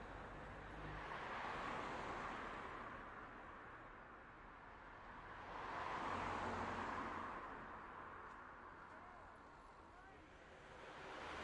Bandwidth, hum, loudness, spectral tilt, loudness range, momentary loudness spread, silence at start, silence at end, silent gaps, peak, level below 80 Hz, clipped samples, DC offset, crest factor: 11 kHz; none; -51 LUFS; -5 dB/octave; 9 LU; 15 LU; 0 s; 0 s; none; -34 dBFS; -66 dBFS; under 0.1%; under 0.1%; 18 dB